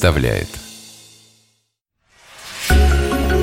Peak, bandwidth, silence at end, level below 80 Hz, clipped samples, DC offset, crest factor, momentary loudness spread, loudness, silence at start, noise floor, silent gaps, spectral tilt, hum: 0 dBFS; 16.5 kHz; 0 s; -22 dBFS; under 0.1%; under 0.1%; 18 dB; 23 LU; -17 LUFS; 0 s; -69 dBFS; none; -5.5 dB/octave; none